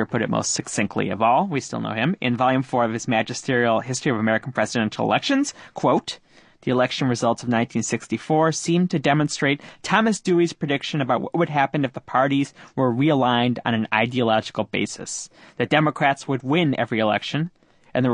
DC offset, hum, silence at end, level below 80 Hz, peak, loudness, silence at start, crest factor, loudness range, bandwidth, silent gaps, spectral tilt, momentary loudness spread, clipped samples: under 0.1%; none; 0 s; -60 dBFS; -2 dBFS; -22 LUFS; 0 s; 20 dB; 1 LU; 10.5 kHz; none; -5 dB/octave; 7 LU; under 0.1%